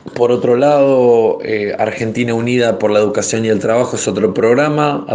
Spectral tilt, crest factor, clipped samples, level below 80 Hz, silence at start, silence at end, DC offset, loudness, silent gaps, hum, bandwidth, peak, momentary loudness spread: -5.5 dB/octave; 12 dB; under 0.1%; -56 dBFS; 0.05 s; 0 s; under 0.1%; -13 LUFS; none; none; 9.8 kHz; 0 dBFS; 7 LU